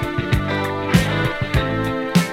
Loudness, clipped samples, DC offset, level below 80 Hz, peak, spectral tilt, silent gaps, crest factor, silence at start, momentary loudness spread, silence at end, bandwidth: -20 LUFS; under 0.1%; under 0.1%; -32 dBFS; 0 dBFS; -6 dB/octave; none; 18 dB; 0 s; 4 LU; 0 s; 16.5 kHz